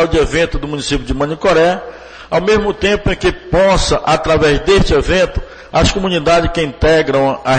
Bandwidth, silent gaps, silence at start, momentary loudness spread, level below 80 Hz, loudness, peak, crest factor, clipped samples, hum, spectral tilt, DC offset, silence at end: 9.4 kHz; none; 0 s; 7 LU; -24 dBFS; -13 LUFS; -2 dBFS; 12 dB; under 0.1%; none; -5 dB/octave; under 0.1%; 0 s